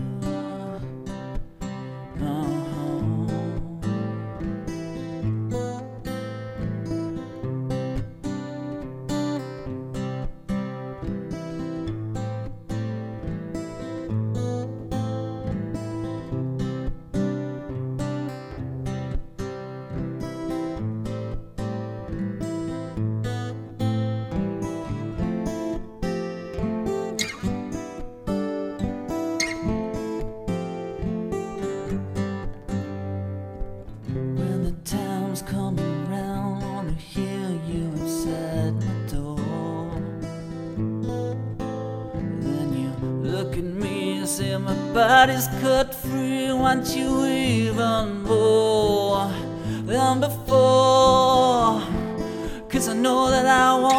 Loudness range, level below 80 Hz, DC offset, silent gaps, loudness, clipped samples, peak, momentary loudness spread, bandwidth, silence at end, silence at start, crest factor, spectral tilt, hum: 11 LU; -40 dBFS; under 0.1%; none; -26 LUFS; under 0.1%; -4 dBFS; 13 LU; 16 kHz; 0 s; 0 s; 22 dB; -5.5 dB/octave; none